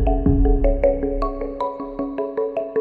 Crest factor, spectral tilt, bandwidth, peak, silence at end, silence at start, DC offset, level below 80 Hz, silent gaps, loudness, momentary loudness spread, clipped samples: 14 dB; -11 dB/octave; 4.7 kHz; -4 dBFS; 0 s; 0 s; under 0.1%; -24 dBFS; none; -22 LUFS; 8 LU; under 0.1%